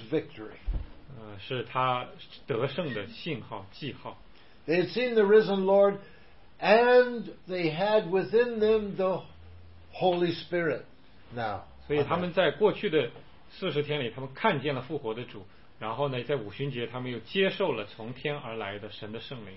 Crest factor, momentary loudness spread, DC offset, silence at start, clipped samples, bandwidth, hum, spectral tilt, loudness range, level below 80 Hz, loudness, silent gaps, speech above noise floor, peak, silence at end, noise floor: 22 dB; 17 LU; 0.3%; 0 s; under 0.1%; 5.8 kHz; none; -9.5 dB/octave; 9 LU; -50 dBFS; -28 LUFS; none; 23 dB; -8 dBFS; 0 s; -51 dBFS